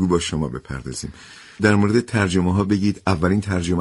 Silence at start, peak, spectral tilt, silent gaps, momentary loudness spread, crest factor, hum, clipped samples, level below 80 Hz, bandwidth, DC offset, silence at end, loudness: 0 s; -4 dBFS; -6 dB/octave; none; 13 LU; 16 dB; none; under 0.1%; -42 dBFS; 11.5 kHz; under 0.1%; 0 s; -20 LUFS